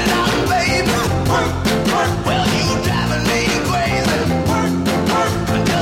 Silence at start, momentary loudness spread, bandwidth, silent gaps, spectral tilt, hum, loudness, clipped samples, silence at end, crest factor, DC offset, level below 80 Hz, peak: 0 s; 2 LU; 16.5 kHz; none; -4.5 dB/octave; none; -17 LUFS; under 0.1%; 0 s; 12 dB; under 0.1%; -32 dBFS; -4 dBFS